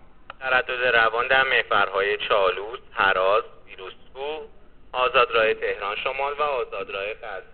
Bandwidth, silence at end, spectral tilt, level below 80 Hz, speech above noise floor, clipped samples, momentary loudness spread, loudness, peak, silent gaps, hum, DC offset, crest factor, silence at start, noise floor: 4.6 kHz; 0.1 s; 1 dB/octave; -52 dBFS; 24 dB; under 0.1%; 16 LU; -22 LUFS; -6 dBFS; none; none; 0.4%; 18 dB; 0.3 s; -47 dBFS